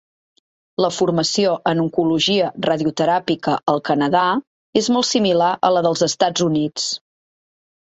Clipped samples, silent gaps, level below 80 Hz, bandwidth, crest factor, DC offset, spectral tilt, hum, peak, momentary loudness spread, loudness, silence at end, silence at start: under 0.1%; 4.47-4.73 s; -60 dBFS; 8.4 kHz; 16 dB; under 0.1%; -4.5 dB/octave; none; -2 dBFS; 5 LU; -18 LUFS; 0.85 s; 0.8 s